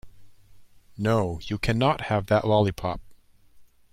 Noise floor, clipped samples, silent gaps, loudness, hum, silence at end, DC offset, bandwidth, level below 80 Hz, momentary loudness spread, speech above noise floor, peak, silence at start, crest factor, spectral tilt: -52 dBFS; under 0.1%; none; -25 LUFS; none; 0.3 s; under 0.1%; 14.5 kHz; -46 dBFS; 10 LU; 29 dB; -10 dBFS; 0.05 s; 18 dB; -7 dB/octave